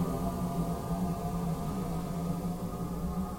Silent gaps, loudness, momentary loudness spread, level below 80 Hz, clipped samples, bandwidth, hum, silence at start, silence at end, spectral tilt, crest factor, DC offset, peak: none; -34 LUFS; 3 LU; -44 dBFS; under 0.1%; 16.5 kHz; none; 0 s; 0 s; -7.5 dB/octave; 12 dB; under 0.1%; -20 dBFS